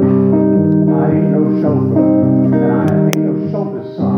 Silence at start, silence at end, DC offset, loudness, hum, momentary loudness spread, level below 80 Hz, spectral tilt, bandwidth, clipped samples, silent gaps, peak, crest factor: 0 s; 0 s; under 0.1%; -13 LUFS; none; 7 LU; -54 dBFS; -9 dB/octave; 17 kHz; under 0.1%; none; 0 dBFS; 12 dB